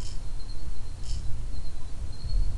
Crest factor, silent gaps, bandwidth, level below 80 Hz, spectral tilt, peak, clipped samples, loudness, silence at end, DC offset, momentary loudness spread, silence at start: 10 dB; none; 11 kHz; -32 dBFS; -5 dB/octave; -14 dBFS; under 0.1%; -39 LUFS; 0 s; under 0.1%; 6 LU; 0 s